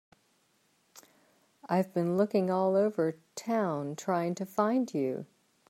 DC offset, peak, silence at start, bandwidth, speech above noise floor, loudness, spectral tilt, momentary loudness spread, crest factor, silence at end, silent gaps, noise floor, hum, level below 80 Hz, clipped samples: under 0.1%; -14 dBFS; 1.65 s; 16 kHz; 41 dB; -30 LUFS; -7 dB/octave; 8 LU; 18 dB; 0.45 s; none; -71 dBFS; none; -82 dBFS; under 0.1%